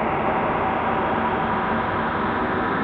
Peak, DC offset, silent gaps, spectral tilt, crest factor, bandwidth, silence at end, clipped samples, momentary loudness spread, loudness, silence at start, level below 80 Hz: -8 dBFS; under 0.1%; none; -8.5 dB/octave; 14 dB; 5.6 kHz; 0 s; under 0.1%; 1 LU; -22 LUFS; 0 s; -44 dBFS